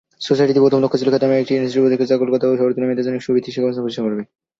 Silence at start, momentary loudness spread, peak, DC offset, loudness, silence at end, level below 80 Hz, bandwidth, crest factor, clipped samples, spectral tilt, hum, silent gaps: 0.2 s; 8 LU; -2 dBFS; under 0.1%; -17 LUFS; 0.35 s; -62 dBFS; 7.6 kHz; 14 dB; under 0.1%; -7 dB/octave; none; none